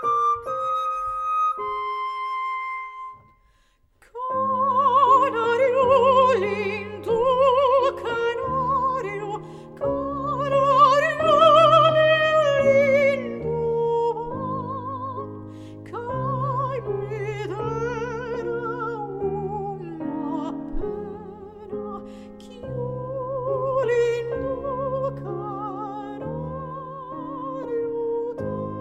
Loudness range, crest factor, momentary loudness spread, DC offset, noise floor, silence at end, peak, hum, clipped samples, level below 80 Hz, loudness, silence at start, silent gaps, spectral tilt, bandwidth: 13 LU; 18 dB; 17 LU; under 0.1%; -62 dBFS; 0 s; -4 dBFS; none; under 0.1%; -48 dBFS; -22 LUFS; 0 s; none; -6 dB/octave; 10.5 kHz